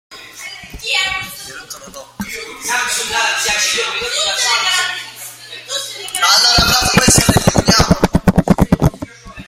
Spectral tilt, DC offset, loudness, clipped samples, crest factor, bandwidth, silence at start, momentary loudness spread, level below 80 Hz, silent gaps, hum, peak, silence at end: -3 dB/octave; under 0.1%; -13 LUFS; under 0.1%; 16 dB; 16.5 kHz; 0.1 s; 20 LU; -30 dBFS; none; none; 0 dBFS; 0.05 s